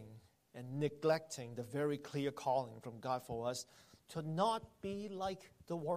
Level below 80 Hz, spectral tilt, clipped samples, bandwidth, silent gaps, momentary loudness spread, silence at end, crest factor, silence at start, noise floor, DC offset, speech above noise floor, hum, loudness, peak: -72 dBFS; -5.5 dB/octave; under 0.1%; 15 kHz; none; 12 LU; 0 s; 18 dB; 0 s; -60 dBFS; under 0.1%; 20 dB; none; -41 LUFS; -22 dBFS